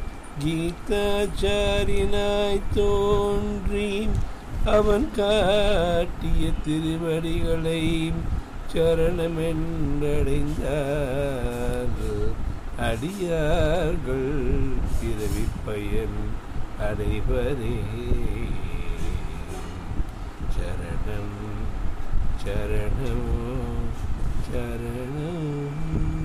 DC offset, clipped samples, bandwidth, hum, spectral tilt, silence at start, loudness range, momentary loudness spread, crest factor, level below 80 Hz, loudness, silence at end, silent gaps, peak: under 0.1%; under 0.1%; 14.5 kHz; none; -6.5 dB/octave; 0 s; 8 LU; 10 LU; 12 dB; -28 dBFS; -27 LUFS; 0 s; none; -10 dBFS